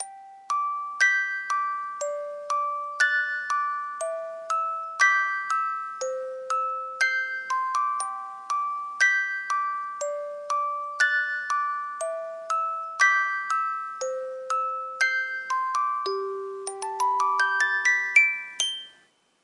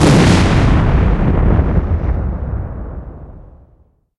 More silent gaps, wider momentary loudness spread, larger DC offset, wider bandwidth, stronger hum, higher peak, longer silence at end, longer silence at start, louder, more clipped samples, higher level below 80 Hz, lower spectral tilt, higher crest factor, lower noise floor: neither; second, 11 LU vs 18 LU; neither; about the same, 11.5 kHz vs 12 kHz; neither; second, -6 dBFS vs 0 dBFS; second, 0.55 s vs 0.75 s; about the same, 0 s vs 0 s; second, -25 LUFS vs -14 LUFS; neither; second, under -90 dBFS vs -18 dBFS; second, 1.5 dB/octave vs -6.5 dB/octave; first, 20 dB vs 14 dB; first, -62 dBFS vs -52 dBFS